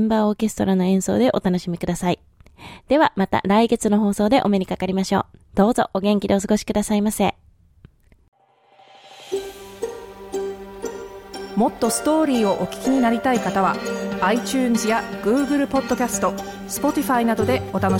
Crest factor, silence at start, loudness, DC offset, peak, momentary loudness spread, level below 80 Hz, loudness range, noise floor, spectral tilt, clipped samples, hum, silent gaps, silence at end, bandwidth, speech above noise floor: 18 dB; 0 s; -20 LUFS; under 0.1%; -4 dBFS; 13 LU; -48 dBFS; 11 LU; -55 dBFS; -5.5 dB/octave; under 0.1%; none; 8.28-8.32 s; 0 s; 17 kHz; 35 dB